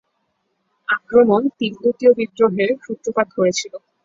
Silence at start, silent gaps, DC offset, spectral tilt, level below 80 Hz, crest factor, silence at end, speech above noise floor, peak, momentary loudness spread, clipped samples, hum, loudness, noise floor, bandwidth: 0.9 s; none; under 0.1%; -4.5 dB/octave; -62 dBFS; 16 dB; 0.25 s; 53 dB; -2 dBFS; 10 LU; under 0.1%; none; -18 LUFS; -70 dBFS; 7.8 kHz